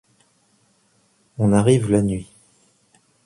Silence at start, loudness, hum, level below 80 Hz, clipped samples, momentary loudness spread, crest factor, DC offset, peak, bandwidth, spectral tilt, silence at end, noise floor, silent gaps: 1.4 s; -19 LUFS; none; -48 dBFS; under 0.1%; 14 LU; 20 dB; under 0.1%; -4 dBFS; 11.5 kHz; -7 dB/octave; 1 s; -62 dBFS; none